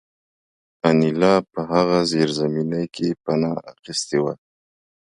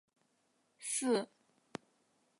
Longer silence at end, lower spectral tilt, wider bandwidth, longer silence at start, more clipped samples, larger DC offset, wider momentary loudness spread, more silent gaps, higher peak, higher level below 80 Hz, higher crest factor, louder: second, 0.8 s vs 1.15 s; first, -5.5 dB/octave vs -3 dB/octave; about the same, 11 kHz vs 11.5 kHz; about the same, 0.85 s vs 0.8 s; neither; neither; second, 9 LU vs 18 LU; first, 3.79-3.83 s vs none; first, -4 dBFS vs -22 dBFS; first, -58 dBFS vs under -90 dBFS; about the same, 18 dB vs 20 dB; first, -21 LUFS vs -36 LUFS